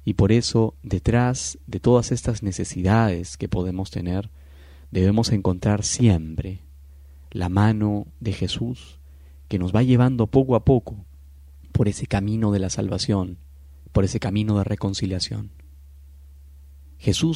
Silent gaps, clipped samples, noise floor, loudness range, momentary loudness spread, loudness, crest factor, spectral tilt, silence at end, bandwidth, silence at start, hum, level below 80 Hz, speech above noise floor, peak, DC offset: none; under 0.1%; -45 dBFS; 5 LU; 11 LU; -22 LUFS; 18 dB; -6 dB/octave; 0 s; 11.5 kHz; 0.05 s; none; -40 dBFS; 24 dB; -4 dBFS; under 0.1%